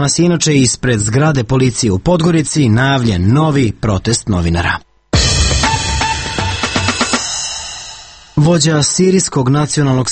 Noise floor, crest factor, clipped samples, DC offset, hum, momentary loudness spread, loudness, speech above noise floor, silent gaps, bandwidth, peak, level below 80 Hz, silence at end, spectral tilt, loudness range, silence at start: -34 dBFS; 12 dB; under 0.1%; under 0.1%; none; 7 LU; -13 LUFS; 22 dB; none; 9 kHz; 0 dBFS; -28 dBFS; 0 s; -4.5 dB/octave; 2 LU; 0 s